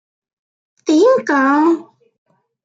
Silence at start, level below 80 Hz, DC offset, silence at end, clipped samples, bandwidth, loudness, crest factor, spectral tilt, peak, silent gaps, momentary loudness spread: 0.85 s; -76 dBFS; under 0.1%; 0.85 s; under 0.1%; 7.8 kHz; -14 LUFS; 14 dB; -4 dB/octave; -2 dBFS; none; 9 LU